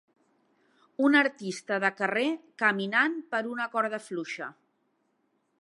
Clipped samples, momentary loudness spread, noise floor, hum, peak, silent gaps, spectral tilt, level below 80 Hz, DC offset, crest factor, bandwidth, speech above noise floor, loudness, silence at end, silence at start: under 0.1%; 14 LU; -74 dBFS; none; -8 dBFS; none; -4.5 dB/octave; -86 dBFS; under 0.1%; 22 dB; 11.5 kHz; 46 dB; -28 LUFS; 1.1 s; 1 s